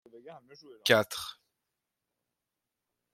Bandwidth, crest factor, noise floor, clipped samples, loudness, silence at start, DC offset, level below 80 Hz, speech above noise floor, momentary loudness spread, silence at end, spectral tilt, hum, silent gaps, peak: 16 kHz; 28 dB; -88 dBFS; under 0.1%; -28 LUFS; 0.15 s; under 0.1%; -76 dBFS; 57 dB; 25 LU; 1.8 s; -3 dB/octave; none; none; -8 dBFS